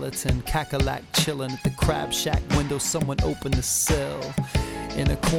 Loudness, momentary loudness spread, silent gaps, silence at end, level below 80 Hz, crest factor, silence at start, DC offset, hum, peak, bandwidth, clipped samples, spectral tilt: -25 LUFS; 5 LU; none; 0 s; -32 dBFS; 16 dB; 0 s; under 0.1%; none; -8 dBFS; 18 kHz; under 0.1%; -4 dB/octave